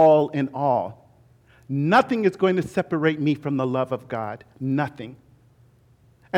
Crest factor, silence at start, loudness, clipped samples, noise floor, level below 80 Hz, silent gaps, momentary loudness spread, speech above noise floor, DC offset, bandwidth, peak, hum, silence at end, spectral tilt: 18 dB; 0 s; -23 LUFS; under 0.1%; -57 dBFS; -64 dBFS; none; 13 LU; 35 dB; under 0.1%; 12.5 kHz; -6 dBFS; none; 0 s; -7.5 dB/octave